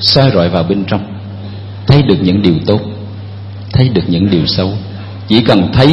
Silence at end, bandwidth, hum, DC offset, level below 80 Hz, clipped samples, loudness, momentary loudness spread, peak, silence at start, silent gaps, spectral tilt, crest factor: 0 s; 9 kHz; none; under 0.1%; -34 dBFS; 0.3%; -11 LUFS; 17 LU; 0 dBFS; 0 s; none; -8 dB/octave; 12 dB